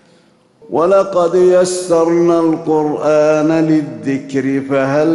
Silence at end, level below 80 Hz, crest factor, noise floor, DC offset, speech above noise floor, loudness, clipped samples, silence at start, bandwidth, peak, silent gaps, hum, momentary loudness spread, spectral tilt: 0 s; -56 dBFS; 10 dB; -50 dBFS; under 0.1%; 38 dB; -13 LUFS; under 0.1%; 0.7 s; 12 kHz; -2 dBFS; none; none; 7 LU; -6 dB/octave